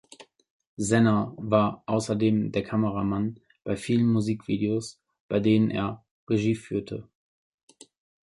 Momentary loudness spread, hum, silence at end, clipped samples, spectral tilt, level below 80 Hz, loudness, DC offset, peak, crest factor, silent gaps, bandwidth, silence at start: 11 LU; none; 1.2 s; under 0.1%; -6.5 dB/octave; -56 dBFS; -26 LUFS; under 0.1%; -8 dBFS; 18 dB; 0.50-0.60 s, 0.67-0.77 s, 5.20-5.29 s, 6.11-6.27 s; 11.5 kHz; 0.2 s